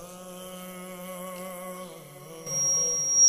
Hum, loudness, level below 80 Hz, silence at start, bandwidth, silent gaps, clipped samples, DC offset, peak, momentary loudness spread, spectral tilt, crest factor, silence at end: none; -27 LUFS; -68 dBFS; 0 s; 16 kHz; none; under 0.1%; under 0.1%; -12 dBFS; 20 LU; -0.5 dB/octave; 18 dB; 0 s